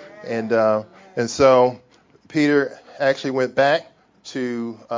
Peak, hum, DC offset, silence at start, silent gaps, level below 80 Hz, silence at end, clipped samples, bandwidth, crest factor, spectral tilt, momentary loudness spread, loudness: -2 dBFS; none; under 0.1%; 0 s; none; -56 dBFS; 0 s; under 0.1%; 7.6 kHz; 18 dB; -5 dB/octave; 13 LU; -20 LUFS